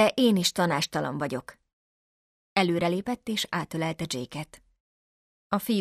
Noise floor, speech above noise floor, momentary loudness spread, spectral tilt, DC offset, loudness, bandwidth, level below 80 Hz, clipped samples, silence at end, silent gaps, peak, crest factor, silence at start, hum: under -90 dBFS; over 63 dB; 11 LU; -4.5 dB/octave; under 0.1%; -27 LUFS; 14.5 kHz; -64 dBFS; under 0.1%; 0 s; 1.73-2.56 s, 4.80-5.50 s; -8 dBFS; 20 dB; 0 s; none